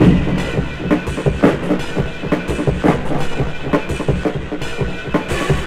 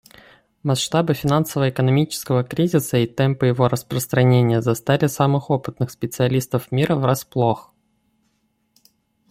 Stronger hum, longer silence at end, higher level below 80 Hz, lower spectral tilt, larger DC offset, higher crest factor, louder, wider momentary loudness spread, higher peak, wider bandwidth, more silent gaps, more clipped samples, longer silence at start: neither; second, 0 s vs 1.7 s; first, -28 dBFS vs -54 dBFS; about the same, -7 dB/octave vs -6 dB/octave; neither; about the same, 16 dB vs 18 dB; about the same, -19 LUFS vs -20 LUFS; about the same, 7 LU vs 6 LU; about the same, 0 dBFS vs -2 dBFS; second, 14 kHz vs 16 kHz; neither; neither; second, 0 s vs 0.65 s